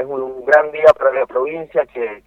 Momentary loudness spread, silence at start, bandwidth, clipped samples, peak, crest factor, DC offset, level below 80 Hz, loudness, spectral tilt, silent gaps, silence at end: 12 LU; 0 s; 7.6 kHz; 0.1%; 0 dBFS; 16 dB; under 0.1%; -54 dBFS; -16 LUFS; -5.5 dB/octave; none; 0.1 s